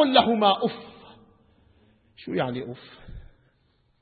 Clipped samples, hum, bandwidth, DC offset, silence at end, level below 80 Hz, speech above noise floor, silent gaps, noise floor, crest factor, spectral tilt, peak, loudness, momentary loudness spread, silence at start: under 0.1%; none; 4.7 kHz; under 0.1%; 0.75 s; -54 dBFS; 42 dB; none; -66 dBFS; 24 dB; -9.5 dB/octave; -2 dBFS; -24 LUFS; 27 LU; 0 s